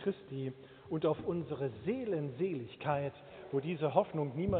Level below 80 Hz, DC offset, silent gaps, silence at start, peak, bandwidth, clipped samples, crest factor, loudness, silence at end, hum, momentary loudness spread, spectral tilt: -64 dBFS; under 0.1%; none; 0 s; -14 dBFS; 4.5 kHz; under 0.1%; 22 dB; -37 LUFS; 0 s; none; 10 LU; -7 dB/octave